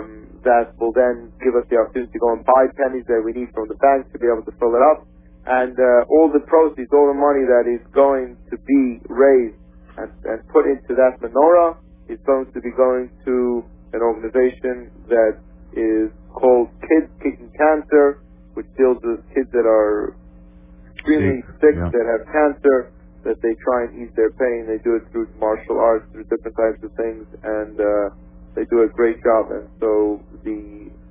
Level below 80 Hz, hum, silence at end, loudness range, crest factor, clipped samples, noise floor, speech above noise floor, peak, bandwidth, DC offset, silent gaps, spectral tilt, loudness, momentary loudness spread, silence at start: -44 dBFS; none; 0.2 s; 5 LU; 18 dB; under 0.1%; -43 dBFS; 26 dB; 0 dBFS; 3.8 kHz; under 0.1%; none; -11 dB/octave; -18 LUFS; 13 LU; 0 s